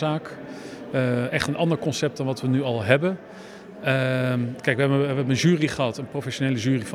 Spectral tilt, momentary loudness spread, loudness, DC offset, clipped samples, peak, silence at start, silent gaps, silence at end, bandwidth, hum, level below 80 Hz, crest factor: -6 dB/octave; 15 LU; -24 LUFS; under 0.1%; under 0.1%; 0 dBFS; 0 s; none; 0 s; 14 kHz; none; -60 dBFS; 24 dB